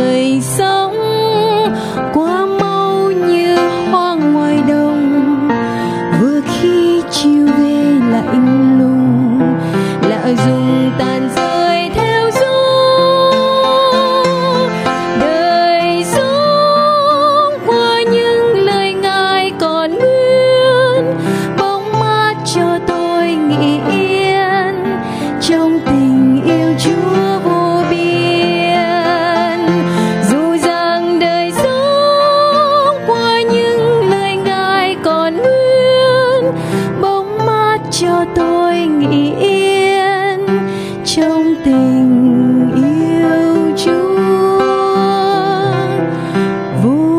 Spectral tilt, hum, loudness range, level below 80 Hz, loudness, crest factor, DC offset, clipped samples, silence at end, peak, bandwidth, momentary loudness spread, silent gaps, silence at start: -5.5 dB/octave; none; 2 LU; -46 dBFS; -12 LUFS; 10 dB; under 0.1%; under 0.1%; 0 s; -2 dBFS; 15.5 kHz; 5 LU; none; 0 s